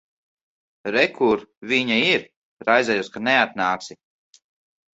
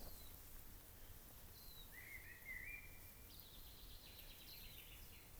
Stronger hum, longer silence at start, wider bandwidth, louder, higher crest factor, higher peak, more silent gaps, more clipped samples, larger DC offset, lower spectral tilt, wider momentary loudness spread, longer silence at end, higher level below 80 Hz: neither; first, 0.85 s vs 0 s; second, 8 kHz vs over 20 kHz; first, -20 LUFS vs -57 LUFS; about the same, 22 dB vs 20 dB; first, -2 dBFS vs -38 dBFS; first, 1.57-1.61 s, 2.36-2.57 s vs none; neither; neither; first, -4 dB/octave vs -2.5 dB/octave; first, 10 LU vs 7 LU; first, 1 s vs 0 s; about the same, -64 dBFS vs -62 dBFS